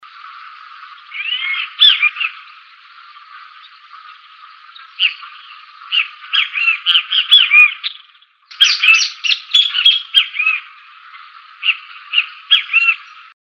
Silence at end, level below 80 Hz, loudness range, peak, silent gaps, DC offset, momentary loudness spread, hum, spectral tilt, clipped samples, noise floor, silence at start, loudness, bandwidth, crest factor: 0.45 s; -80 dBFS; 12 LU; 0 dBFS; none; under 0.1%; 14 LU; none; 8 dB/octave; under 0.1%; -49 dBFS; 0.25 s; -12 LUFS; 16 kHz; 16 dB